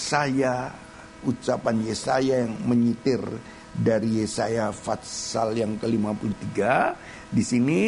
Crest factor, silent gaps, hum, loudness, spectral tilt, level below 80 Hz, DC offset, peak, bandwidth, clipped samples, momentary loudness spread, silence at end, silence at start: 18 dB; none; none; -25 LUFS; -5.5 dB/octave; -54 dBFS; under 0.1%; -6 dBFS; 11 kHz; under 0.1%; 9 LU; 0 s; 0 s